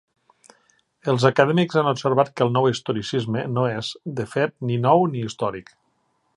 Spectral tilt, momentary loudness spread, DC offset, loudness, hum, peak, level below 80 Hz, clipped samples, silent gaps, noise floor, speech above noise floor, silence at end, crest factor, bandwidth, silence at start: -6.5 dB/octave; 10 LU; under 0.1%; -22 LUFS; none; -2 dBFS; -62 dBFS; under 0.1%; none; -68 dBFS; 47 dB; 0.75 s; 22 dB; 11 kHz; 1.05 s